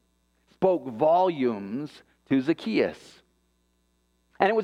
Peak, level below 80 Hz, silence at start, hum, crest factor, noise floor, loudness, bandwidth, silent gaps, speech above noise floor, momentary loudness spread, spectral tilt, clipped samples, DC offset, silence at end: -4 dBFS; -70 dBFS; 0.6 s; none; 22 dB; -70 dBFS; -26 LUFS; 10.5 kHz; none; 45 dB; 12 LU; -7 dB/octave; under 0.1%; under 0.1%; 0 s